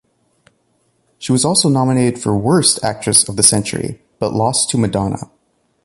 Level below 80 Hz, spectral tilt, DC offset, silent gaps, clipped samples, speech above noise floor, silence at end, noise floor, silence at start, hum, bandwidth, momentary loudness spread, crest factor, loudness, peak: -46 dBFS; -4 dB/octave; under 0.1%; none; under 0.1%; 47 dB; 0.6 s; -62 dBFS; 1.2 s; none; 16 kHz; 12 LU; 16 dB; -14 LUFS; 0 dBFS